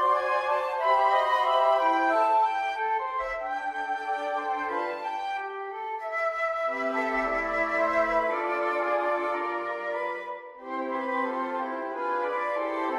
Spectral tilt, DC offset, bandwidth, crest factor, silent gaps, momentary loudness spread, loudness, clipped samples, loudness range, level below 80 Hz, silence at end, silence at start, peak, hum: -3.5 dB/octave; under 0.1%; 12.5 kHz; 16 dB; none; 9 LU; -27 LUFS; under 0.1%; 6 LU; -60 dBFS; 0 s; 0 s; -12 dBFS; none